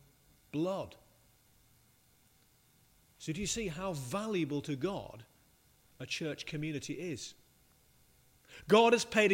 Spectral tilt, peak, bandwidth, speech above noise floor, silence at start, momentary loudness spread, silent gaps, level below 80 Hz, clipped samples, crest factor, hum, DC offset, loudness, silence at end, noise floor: -4.5 dB/octave; -12 dBFS; 16 kHz; 35 dB; 0.55 s; 21 LU; none; -64 dBFS; under 0.1%; 24 dB; none; under 0.1%; -34 LUFS; 0 s; -68 dBFS